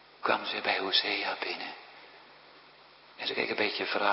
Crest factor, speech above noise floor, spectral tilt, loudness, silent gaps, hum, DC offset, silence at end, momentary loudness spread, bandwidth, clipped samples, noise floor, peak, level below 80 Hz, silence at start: 22 dB; 25 dB; -6 dB/octave; -30 LUFS; none; none; under 0.1%; 0 s; 16 LU; 6 kHz; under 0.1%; -56 dBFS; -10 dBFS; -80 dBFS; 0.2 s